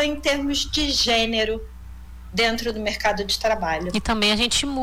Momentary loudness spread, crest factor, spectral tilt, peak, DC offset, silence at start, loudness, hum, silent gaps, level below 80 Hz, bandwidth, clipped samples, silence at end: 7 LU; 14 dB; -2.5 dB/octave; -8 dBFS; under 0.1%; 0 s; -21 LUFS; none; none; -38 dBFS; 19 kHz; under 0.1%; 0 s